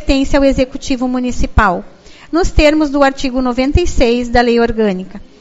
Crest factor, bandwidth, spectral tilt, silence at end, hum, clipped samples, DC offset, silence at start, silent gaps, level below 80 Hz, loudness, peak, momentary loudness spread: 12 dB; 8 kHz; -5.5 dB/octave; 0.15 s; none; 0.1%; under 0.1%; 0 s; none; -22 dBFS; -14 LUFS; 0 dBFS; 7 LU